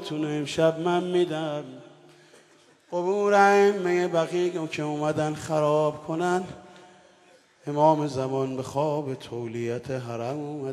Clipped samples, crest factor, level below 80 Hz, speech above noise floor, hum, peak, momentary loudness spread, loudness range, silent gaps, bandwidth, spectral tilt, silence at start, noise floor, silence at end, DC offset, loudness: under 0.1%; 20 dB; -68 dBFS; 33 dB; none; -6 dBFS; 12 LU; 5 LU; none; 13 kHz; -6 dB/octave; 0 s; -58 dBFS; 0 s; under 0.1%; -25 LUFS